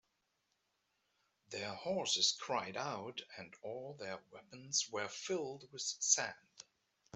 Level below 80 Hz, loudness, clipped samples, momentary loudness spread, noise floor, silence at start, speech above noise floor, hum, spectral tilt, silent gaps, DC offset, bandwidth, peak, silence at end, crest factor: -86 dBFS; -38 LUFS; under 0.1%; 19 LU; -83 dBFS; 1.5 s; 43 dB; none; -1 dB/octave; none; under 0.1%; 8.2 kHz; -16 dBFS; 0.55 s; 26 dB